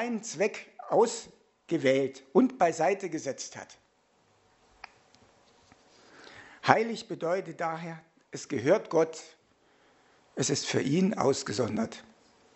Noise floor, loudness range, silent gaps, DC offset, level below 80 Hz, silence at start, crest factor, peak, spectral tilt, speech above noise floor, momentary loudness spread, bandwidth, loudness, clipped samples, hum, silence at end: -68 dBFS; 6 LU; none; under 0.1%; -74 dBFS; 0 s; 30 dB; 0 dBFS; -4.5 dB/octave; 39 dB; 19 LU; 8.2 kHz; -29 LUFS; under 0.1%; none; 0.55 s